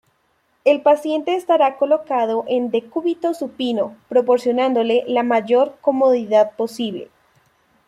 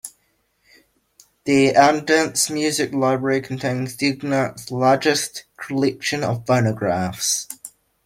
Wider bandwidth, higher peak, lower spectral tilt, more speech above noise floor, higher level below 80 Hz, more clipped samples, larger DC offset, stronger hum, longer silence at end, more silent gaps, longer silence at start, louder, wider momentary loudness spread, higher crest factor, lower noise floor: second, 13.5 kHz vs 16.5 kHz; about the same, -2 dBFS vs -2 dBFS; about the same, -5 dB/octave vs -4 dB/octave; about the same, 46 dB vs 46 dB; second, -68 dBFS vs -60 dBFS; neither; neither; neither; first, 0.85 s vs 0.35 s; neither; first, 0.65 s vs 0.05 s; about the same, -18 LUFS vs -20 LUFS; second, 8 LU vs 12 LU; about the same, 16 dB vs 20 dB; about the same, -64 dBFS vs -66 dBFS